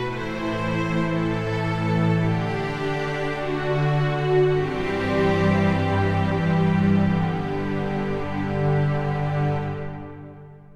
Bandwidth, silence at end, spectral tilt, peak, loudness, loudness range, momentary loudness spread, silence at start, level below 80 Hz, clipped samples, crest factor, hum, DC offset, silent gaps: 9.2 kHz; 0 s; -8 dB/octave; -8 dBFS; -23 LUFS; 3 LU; 7 LU; 0 s; -42 dBFS; under 0.1%; 14 dB; none; under 0.1%; none